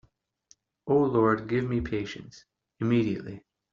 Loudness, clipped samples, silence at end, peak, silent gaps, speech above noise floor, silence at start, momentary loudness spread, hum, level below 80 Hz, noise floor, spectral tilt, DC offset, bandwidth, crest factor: -27 LUFS; under 0.1%; 0.35 s; -10 dBFS; none; 37 dB; 0.85 s; 19 LU; none; -54 dBFS; -64 dBFS; -7 dB/octave; under 0.1%; 7.4 kHz; 18 dB